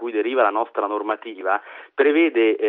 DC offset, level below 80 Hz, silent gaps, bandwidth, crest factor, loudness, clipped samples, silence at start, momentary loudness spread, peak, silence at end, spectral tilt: under 0.1%; under -90 dBFS; none; 4 kHz; 16 dB; -21 LUFS; under 0.1%; 0 s; 9 LU; -6 dBFS; 0 s; 0 dB/octave